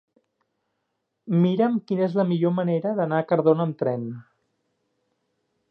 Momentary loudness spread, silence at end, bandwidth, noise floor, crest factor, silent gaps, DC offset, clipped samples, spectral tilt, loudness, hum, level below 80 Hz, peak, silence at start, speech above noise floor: 7 LU; 1.5 s; 5.4 kHz; -78 dBFS; 18 dB; none; under 0.1%; under 0.1%; -10.5 dB/octave; -23 LUFS; none; -78 dBFS; -6 dBFS; 1.25 s; 56 dB